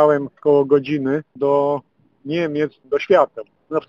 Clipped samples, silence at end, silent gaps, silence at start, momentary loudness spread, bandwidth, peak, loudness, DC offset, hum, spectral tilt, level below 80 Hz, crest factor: under 0.1%; 0.05 s; none; 0 s; 10 LU; 6.6 kHz; -2 dBFS; -19 LUFS; under 0.1%; none; -8 dB/octave; -62 dBFS; 18 dB